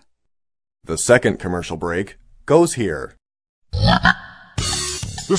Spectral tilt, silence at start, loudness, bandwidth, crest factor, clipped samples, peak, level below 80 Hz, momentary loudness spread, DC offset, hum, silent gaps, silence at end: -4.5 dB/octave; 0.9 s; -19 LUFS; 11 kHz; 20 dB; under 0.1%; 0 dBFS; -36 dBFS; 15 LU; under 0.1%; none; 3.49-3.62 s; 0 s